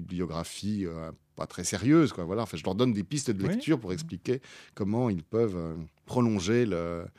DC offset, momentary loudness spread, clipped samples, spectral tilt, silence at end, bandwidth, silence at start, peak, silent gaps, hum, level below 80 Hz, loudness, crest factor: under 0.1%; 12 LU; under 0.1%; -6 dB/octave; 0.1 s; 14.5 kHz; 0 s; -12 dBFS; none; none; -56 dBFS; -29 LUFS; 18 dB